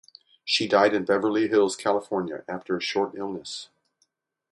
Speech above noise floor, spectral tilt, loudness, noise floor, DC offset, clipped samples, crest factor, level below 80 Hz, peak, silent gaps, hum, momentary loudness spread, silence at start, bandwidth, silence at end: 48 dB; -4 dB/octave; -25 LUFS; -72 dBFS; under 0.1%; under 0.1%; 20 dB; -68 dBFS; -6 dBFS; none; none; 14 LU; 0.45 s; 11.5 kHz; 0.9 s